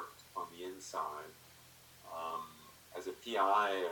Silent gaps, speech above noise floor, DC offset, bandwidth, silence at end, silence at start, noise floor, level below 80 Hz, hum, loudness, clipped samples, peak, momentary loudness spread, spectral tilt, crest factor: none; 24 dB; under 0.1%; 19 kHz; 0 s; 0 s; -60 dBFS; -78 dBFS; none; -38 LUFS; under 0.1%; -20 dBFS; 25 LU; -2.5 dB/octave; 20 dB